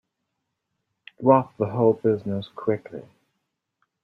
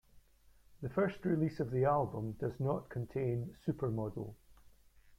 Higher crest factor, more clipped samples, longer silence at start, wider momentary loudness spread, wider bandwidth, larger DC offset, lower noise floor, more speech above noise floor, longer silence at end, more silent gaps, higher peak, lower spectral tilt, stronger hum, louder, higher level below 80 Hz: about the same, 22 dB vs 18 dB; neither; first, 1.2 s vs 0.15 s; first, 12 LU vs 9 LU; second, 4.7 kHz vs 14.5 kHz; neither; first, -80 dBFS vs -65 dBFS; first, 57 dB vs 29 dB; first, 1.05 s vs 0.05 s; neither; first, -4 dBFS vs -20 dBFS; about the same, -10 dB/octave vs -9.5 dB/octave; neither; first, -23 LUFS vs -37 LUFS; second, -68 dBFS vs -62 dBFS